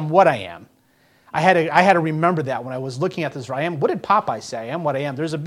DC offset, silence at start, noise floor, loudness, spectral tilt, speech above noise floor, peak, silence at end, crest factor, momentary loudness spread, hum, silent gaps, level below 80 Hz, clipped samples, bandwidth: under 0.1%; 0 s; -58 dBFS; -20 LUFS; -6 dB/octave; 38 dB; 0 dBFS; 0 s; 20 dB; 13 LU; none; none; -62 dBFS; under 0.1%; 15 kHz